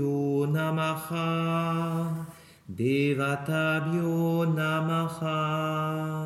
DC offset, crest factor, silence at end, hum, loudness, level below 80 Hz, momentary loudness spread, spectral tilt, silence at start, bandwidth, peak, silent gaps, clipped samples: under 0.1%; 14 dB; 0 s; none; -28 LUFS; -70 dBFS; 5 LU; -7 dB/octave; 0 s; 14 kHz; -14 dBFS; none; under 0.1%